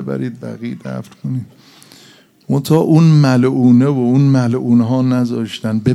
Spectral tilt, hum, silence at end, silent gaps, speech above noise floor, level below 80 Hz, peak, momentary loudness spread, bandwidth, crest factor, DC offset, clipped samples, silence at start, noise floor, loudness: -8 dB/octave; none; 0 s; none; 32 dB; -56 dBFS; 0 dBFS; 16 LU; 13.5 kHz; 14 dB; under 0.1%; under 0.1%; 0 s; -46 dBFS; -13 LUFS